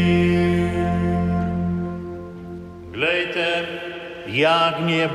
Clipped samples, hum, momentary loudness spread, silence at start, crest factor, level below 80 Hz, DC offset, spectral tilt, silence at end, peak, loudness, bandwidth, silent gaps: under 0.1%; none; 17 LU; 0 s; 16 dB; -42 dBFS; under 0.1%; -6.5 dB/octave; 0 s; -4 dBFS; -21 LUFS; 10.5 kHz; none